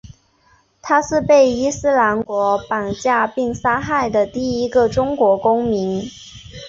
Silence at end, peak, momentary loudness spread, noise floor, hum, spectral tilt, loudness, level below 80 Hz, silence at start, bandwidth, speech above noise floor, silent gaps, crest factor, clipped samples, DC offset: 0 s; -2 dBFS; 9 LU; -56 dBFS; none; -5 dB/octave; -17 LUFS; -46 dBFS; 0.05 s; 7.8 kHz; 40 dB; none; 16 dB; under 0.1%; under 0.1%